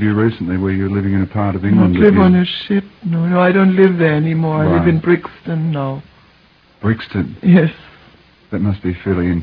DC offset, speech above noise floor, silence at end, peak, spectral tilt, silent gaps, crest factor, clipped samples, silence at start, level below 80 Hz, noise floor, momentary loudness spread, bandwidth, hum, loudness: under 0.1%; 36 dB; 0 s; 0 dBFS; -10.5 dB/octave; none; 14 dB; under 0.1%; 0 s; -42 dBFS; -50 dBFS; 10 LU; 5.2 kHz; none; -15 LUFS